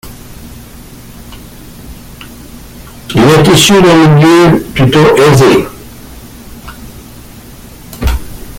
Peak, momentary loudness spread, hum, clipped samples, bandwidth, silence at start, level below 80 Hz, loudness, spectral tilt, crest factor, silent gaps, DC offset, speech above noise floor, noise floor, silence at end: 0 dBFS; 26 LU; none; 0.1%; 17 kHz; 0.05 s; -26 dBFS; -6 LUFS; -5.5 dB/octave; 10 dB; none; under 0.1%; 26 dB; -31 dBFS; 0 s